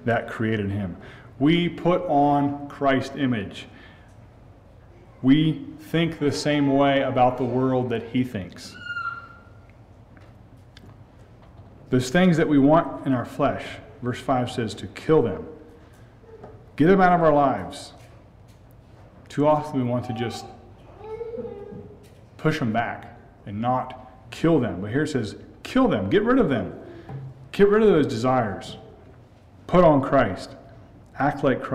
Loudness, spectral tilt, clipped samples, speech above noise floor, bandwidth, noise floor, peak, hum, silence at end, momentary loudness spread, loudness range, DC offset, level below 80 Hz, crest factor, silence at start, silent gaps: -22 LUFS; -7 dB/octave; under 0.1%; 28 dB; 13 kHz; -49 dBFS; -6 dBFS; none; 0 s; 20 LU; 7 LU; under 0.1%; -48 dBFS; 18 dB; 0 s; none